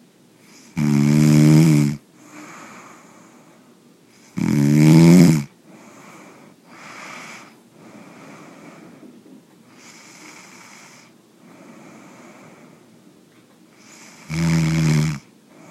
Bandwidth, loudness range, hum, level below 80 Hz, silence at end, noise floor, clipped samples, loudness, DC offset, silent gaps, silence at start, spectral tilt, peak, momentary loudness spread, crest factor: 15 kHz; 23 LU; none; -50 dBFS; 0.5 s; -51 dBFS; under 0.1%; -15 LUFS; under 0.1%; none; 0.75 s; -7 dB/octave; 0 dBFS; 29 LU; 20 dB